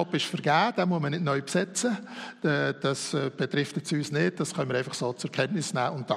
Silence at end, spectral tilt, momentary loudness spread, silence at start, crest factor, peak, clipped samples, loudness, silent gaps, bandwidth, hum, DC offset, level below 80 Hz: 0 s; -4.5 dB/octave; 6 LU; 0 s; 18 dB; -10 dBFS; under 0.1%; -28 LUFS; none; 13.5 kHz; none; under 0.1%; -72 dBFS